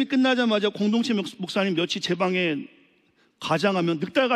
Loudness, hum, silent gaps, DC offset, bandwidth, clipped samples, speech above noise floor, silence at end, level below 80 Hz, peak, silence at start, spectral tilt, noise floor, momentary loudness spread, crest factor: -24 LUFS; none; none; under 0.1%; 12.5 kHz; under 0.1%; 40 dB; 0 s; -72 dBFS; -8 dBFS; 0 s; -5.5 dB/octave; -63 dBFS; 7 LU; 16 dB